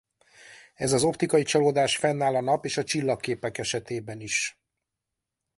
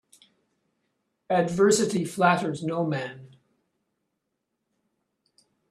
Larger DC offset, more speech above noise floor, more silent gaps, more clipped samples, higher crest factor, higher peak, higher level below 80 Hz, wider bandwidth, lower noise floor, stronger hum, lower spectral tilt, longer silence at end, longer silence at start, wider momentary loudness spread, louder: neither; about the same, 60 dB vs 57 dB; neither; neither; second, 18 dB vs 24 dB; about the same, -8 dBFS vs -6 dBFS; first, -62 dBFS vs -68 dBFS; second, 11.5 kHz vs 13.5 kHz; first, -86 dBFS vs -80 dBFS; neither; about the same, -4 dB/octave vs -5 dB/octave; second, 1.05 s vs 2.45 s; second, 0.45 s vs 1.3 s; about the same, 9 LU vs 8 LU; about the same, -26 LUFS vs -24 LUFS